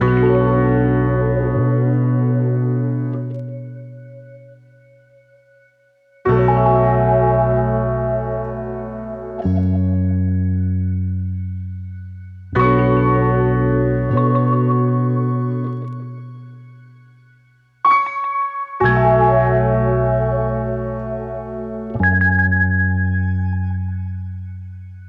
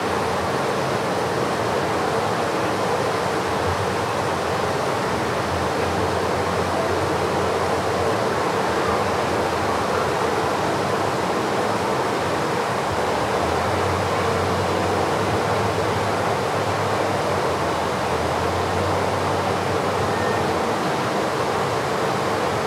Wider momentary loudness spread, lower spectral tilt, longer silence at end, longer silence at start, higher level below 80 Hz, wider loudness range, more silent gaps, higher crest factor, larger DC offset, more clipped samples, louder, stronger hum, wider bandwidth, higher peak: first, 15 LU vs 1 LU; first, -11 dB/octave vs -5 dB/octave; about the same, 0 s vs 0 s; about the same, 0 s vs 0 s; first, -36 dBFS vs -50 dBFS; first, 6 LU vs 1 LU; neither; about the same, 14 dB vs 14 dB; neither; neither; first, -18 LUFS vs -22 LUFS; first, 60 Hz at -55 dBFS vs none; second, 4.7 kHz vs 16.5 kHz; first, -4 dBFS vs -8 dBFS